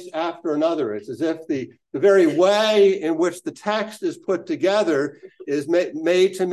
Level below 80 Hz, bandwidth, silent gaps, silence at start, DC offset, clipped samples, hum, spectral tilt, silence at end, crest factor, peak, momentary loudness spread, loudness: -74 dBFS; 12.5 kHz; none; 0 s; under 0.1%; under 0.1%; none; -5 dB/octave; 0 s; 14 dB; -6 dBFS; 12 LU; -21 LUFS